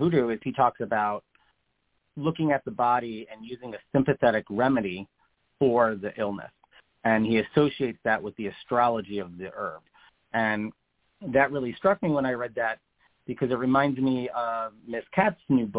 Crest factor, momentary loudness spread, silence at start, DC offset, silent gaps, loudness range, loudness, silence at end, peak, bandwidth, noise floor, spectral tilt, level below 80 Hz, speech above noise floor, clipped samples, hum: 20 dB; 15 LU; 0 s; under 0.1%; none; 3 LU; -26 LUFS; 0 s; -6 dBFS; 4 kHz; -75 dBFS; -10.5 dB/octave; -60 dBFS; 49 dB; under 0.1%; none